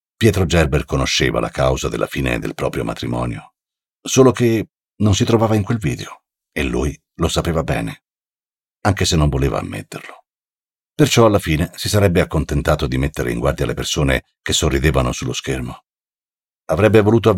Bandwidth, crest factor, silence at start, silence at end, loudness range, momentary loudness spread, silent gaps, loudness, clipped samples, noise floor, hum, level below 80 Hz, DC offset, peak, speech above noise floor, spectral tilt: 17 kHz; 16 dB; 0.2 s; 0 s; 4 LU; 12 LU; none; -18 LUFS; under 0.1%; under -90 dBFS; none; -30 dBFS; under 0.1%; -2 dBFS; over 73 dB; -5 dB/octave